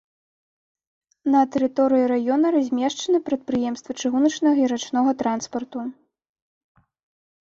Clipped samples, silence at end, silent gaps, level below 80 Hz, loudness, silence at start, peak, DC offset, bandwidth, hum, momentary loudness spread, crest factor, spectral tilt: under 0.1%; 1.55 s; none; -66 dBFS; -22 LUFS; 1.25 s; -8 dBFS; under 0.1%; 7.6 kHz; none; 10 LU; 14 dB; -4 dB/octave